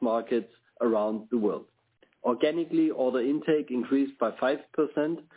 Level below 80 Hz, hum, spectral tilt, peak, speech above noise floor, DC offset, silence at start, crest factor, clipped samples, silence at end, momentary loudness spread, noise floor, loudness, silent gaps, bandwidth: -76 dBFS; none; -10 dB/octave; -12 dBFS; 39 dB; under 0.1%; 0 s; 16 dB; under 0.1%; 0.15 s; 5 LU; -66 dBFS; -28 LUFS; none; 4 kHz